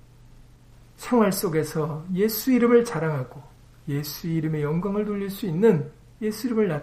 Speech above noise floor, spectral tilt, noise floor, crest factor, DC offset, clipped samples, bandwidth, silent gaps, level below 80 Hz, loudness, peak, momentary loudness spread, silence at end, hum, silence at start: 27 dB; -6.5 dB/octave; -50 dBFS; 18 dB; under 0.1%; under 0.1%; 15.5 kHz; none; -52 dBFS; -24 LUFS; -6 dBFS; 11 LU; 0 s; none; 0.4 s